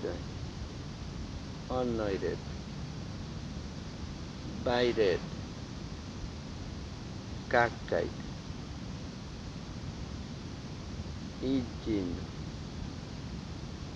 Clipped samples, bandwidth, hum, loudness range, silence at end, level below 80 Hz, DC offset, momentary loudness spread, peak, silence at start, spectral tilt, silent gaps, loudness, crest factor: under 0.1%; 11 kHz; none; 5 LU; 0 s; -48 dBFS; under 0.1%; 13 LU; -12 dBFS; 0 s; -6 dB/octave; none; -37 LUFS; 24 dB